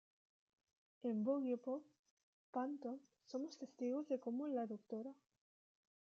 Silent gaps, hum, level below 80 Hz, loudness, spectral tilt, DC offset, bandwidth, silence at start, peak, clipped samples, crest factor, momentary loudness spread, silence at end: 1.99-2.04 s, 2.11-2.17 s, 2.23-2.53 s; none; under -90 dBFS; -45 LUFS; -6.5 dB/octave; under 0.1%; 7.2 kHz; 1.05 s; -28 dBFS; under 0.1%; 18 dB; 11 LU; 0.95 s